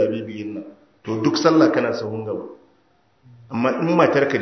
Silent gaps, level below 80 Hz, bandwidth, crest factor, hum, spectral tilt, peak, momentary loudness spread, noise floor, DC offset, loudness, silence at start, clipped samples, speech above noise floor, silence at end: none; -64 dBFS; 6.4 kHz; 20 dB; none; -6 dB/octave; 0 dBFS; 16 LU; -61 dBFS; under 0.1%; -20 LUFS; 0 s; under 0.1%; 42 dB; 0 s